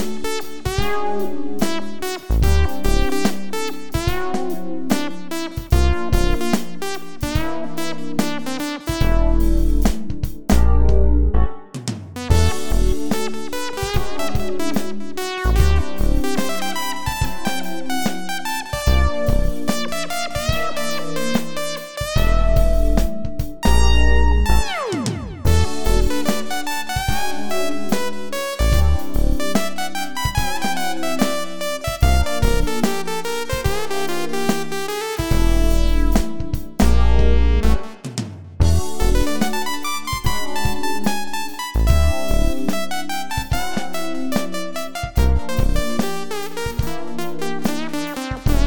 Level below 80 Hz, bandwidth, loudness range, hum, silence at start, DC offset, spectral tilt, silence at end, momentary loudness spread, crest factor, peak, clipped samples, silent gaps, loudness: -22 dBFS; 19 kHz; 4 LU; none; 0 s; 9%; -5 dB/octave; 0 s; 9 LU; 18 dB; 0 dBFS; under 0.1%; none; -22 LUFS